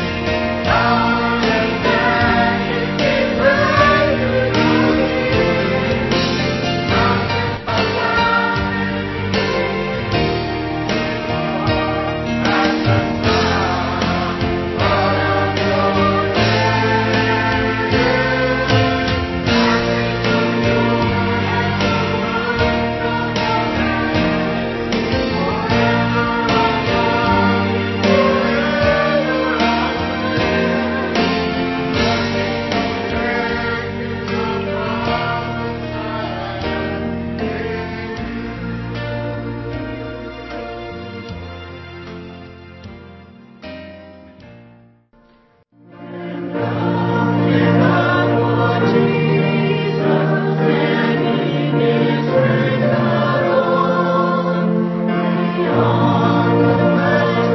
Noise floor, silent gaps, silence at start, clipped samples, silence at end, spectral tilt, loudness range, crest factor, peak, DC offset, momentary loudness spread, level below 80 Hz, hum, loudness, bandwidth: -53 dBFS; none; 0 s; under 0.1%; 0 s; -6.5 dB/octave; 10 LU; 16 dB; -2 dBFS; under 0.1%; 11 LU; -34 dBFS; none; -17 LUFS; 6.2 kHz